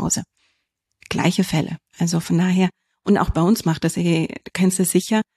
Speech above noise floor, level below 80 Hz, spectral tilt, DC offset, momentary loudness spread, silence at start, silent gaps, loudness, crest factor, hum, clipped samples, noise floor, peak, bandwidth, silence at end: 55 dB; -40 dBFS; -5 dB/octave; under 0.1%; 7 LU; 0 s; none; -20 LUFS; 16 dB; none; under 0.1%; -73 dBFS; -4 dBFS; 13.5 kHz; 0.15 s